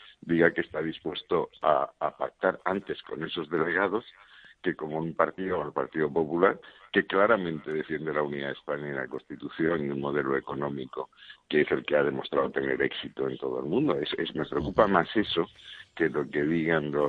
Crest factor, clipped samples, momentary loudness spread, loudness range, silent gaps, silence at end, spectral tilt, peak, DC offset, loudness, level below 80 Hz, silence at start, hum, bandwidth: 24 dB; under 0.1%; 10 LU; 3 LU; none; 0 s; -8 dB/octave; -6 dBFS; under 0.1%; -29 LUFS; -60 dBFS; 0 s; none; 5 kHz